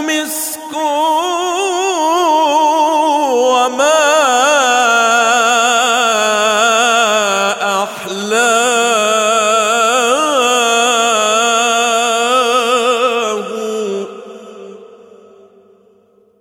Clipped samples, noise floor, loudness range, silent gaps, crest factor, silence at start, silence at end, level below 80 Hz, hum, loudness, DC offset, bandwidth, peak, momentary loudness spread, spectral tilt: under 0.1%; -51 dBFS; 5 LU; none; 12 dB; 0 s; 1.55 s; -66 dBFS; none; -12 LUFS; under 0.1%; 18 kHz; 0 dBFS; 9 LU; -0.5 dB/octave